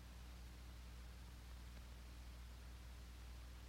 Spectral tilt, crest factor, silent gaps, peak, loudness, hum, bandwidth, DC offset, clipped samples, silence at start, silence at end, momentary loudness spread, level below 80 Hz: -4.5 dB/octave; 10 dB; none; -46 dBFS; -58 LUFS; 60 Hz at -55 dBFS; 16 kHz; under 0.1%; under 0.1%; 0 s; 0 s; 0 LU; -56 dBFS